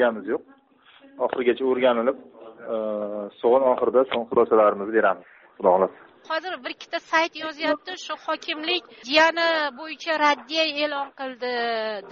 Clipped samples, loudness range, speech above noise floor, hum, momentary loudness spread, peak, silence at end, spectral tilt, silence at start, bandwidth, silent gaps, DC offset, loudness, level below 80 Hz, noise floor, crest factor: under 0.1%; 4 LU; 30 dB; none; 12 LU; -4 dBFS; 0 s; -0.5 dB/octave; 0 s; 7.2 kHz; none; under 0.1%; -23 LUFS; -70 dBFS; -54 dBFS; 20 dB